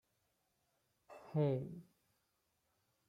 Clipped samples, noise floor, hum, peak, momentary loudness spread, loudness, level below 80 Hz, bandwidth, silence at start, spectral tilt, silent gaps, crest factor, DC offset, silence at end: under 0.1%; -83 dBFS; none; -24 dBFS; 23 LU; -40 LUFS; -82 dBFS; 5.6 kHz; 1.1 s; -10 dB/octave; none; 20 dB; under 0.1%; 1.25 s